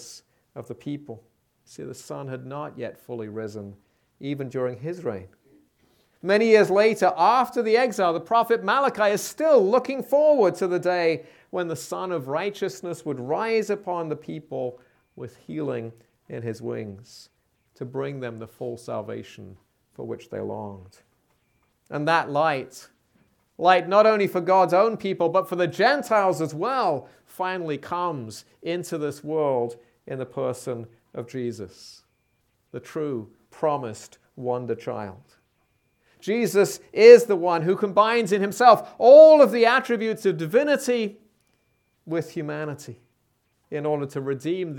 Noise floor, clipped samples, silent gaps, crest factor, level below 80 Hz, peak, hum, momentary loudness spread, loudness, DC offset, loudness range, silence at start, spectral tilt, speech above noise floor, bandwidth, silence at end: -70 dBFS; under 0.1%; none; 22 dB; -74 dBFS; 0 dBFS; none; 19 LU; -22 LUFS; under 0.1%; 18 LU; 0 s; -5.5 dB/octave; 48 dB; 18.5 kHz; 0 s